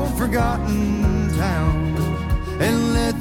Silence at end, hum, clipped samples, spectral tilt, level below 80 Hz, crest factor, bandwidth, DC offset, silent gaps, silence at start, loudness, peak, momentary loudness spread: 0 s; none; under 0.1%; -6.5 dB/octave; -26 dBFS; 12 dB; 17 kHz; under 0.1%; none; 0 s; -21 LUFS; -8 dBFS; 3 LU